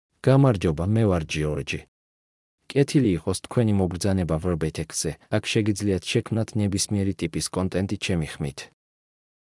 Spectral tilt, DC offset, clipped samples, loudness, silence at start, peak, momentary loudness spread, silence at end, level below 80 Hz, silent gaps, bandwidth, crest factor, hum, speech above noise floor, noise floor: -5.5 dB/octave; under 0.1%; under 0.1%; -24 LUFS; 0.25 s; -6 dBFS; 7 LU; 0.8 s; -48 dBFS; 1.88-2.58 s; 12 kHz; 18 dB; none; over 67 dB; under -90 dBFS